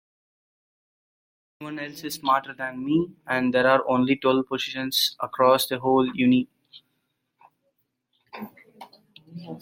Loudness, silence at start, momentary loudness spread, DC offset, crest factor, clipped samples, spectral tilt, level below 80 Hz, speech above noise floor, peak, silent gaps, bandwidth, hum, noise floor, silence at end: -23 LUFS; 1.6 s; 20 LU; under 0.1%; 20 dB; under 0.1%; -4.5 dB/octave; -66 dBFS; 52 dB; -4 dBFS; none; 16.5 kHz; none; -76 dBFS; 0 s